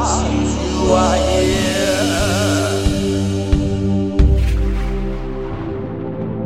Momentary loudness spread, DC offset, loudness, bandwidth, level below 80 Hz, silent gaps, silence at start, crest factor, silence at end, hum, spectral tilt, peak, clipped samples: 10 LU; 1%; -18 LUFS; 15.5 kHz; -22 dBFS; none; 0 s; 16 dB; 0 s; none; -5.5 dB/octave; -2 dBFS; under 0.1%